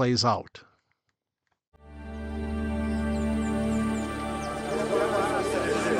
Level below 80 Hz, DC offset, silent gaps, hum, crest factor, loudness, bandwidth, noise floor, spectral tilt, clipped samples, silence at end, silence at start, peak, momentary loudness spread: -40 dBFS; under 0.1%; 1.68-1.72 s; none; 18 dB; -28 LUFS; 15.5 kHz; -81 dBFS; -5.5 dB/octave; under 0.1%; 0 s; 0 s; -10 dBFS; 11 LU